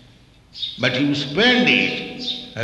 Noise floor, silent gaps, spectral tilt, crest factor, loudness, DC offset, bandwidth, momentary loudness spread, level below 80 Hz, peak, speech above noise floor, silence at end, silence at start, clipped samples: -50 dBFS; none; -4.5 dB/octave; 18 dB; -18 LUFS; under 0.1%; 10.5 kHz; 12 LU; -54 dBFS; -2 dBFS; 31 dB; 0 s; 0.55 s; under 0.1%